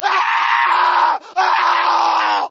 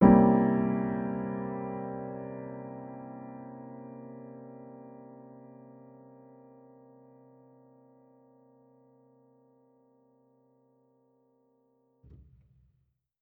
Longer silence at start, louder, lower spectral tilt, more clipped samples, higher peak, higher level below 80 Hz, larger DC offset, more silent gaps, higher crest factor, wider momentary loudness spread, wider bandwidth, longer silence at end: about the same, 0 s vs 0 s; first, -15 LUFS vs -30 LUFS; second, 0.5 dB/octave vs -10.5 dB/octave; neither; first, -2 dBFS vs -6 dBFS; second, -78 dBFS vs -56 dBFS; neither; neither; second, 14 dB vs 28 dB; second, 3 LU vs 27 LU; first, 7.8 kHz vs 3.2 kHz; second, 0 s vs 7.85 s